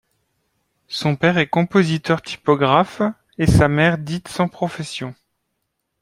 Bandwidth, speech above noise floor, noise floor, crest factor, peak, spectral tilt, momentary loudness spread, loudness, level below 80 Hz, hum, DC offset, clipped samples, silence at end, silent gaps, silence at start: 12.5 kHz; 57 dB; -74 dBFS; 20 dB; 0 dBFS; -6.5 dB/octave; 12 LU; -19 LUFS; -38 dBFS; none; under 0.1%; under 0.1%; 0.9 s; none; 0.9 s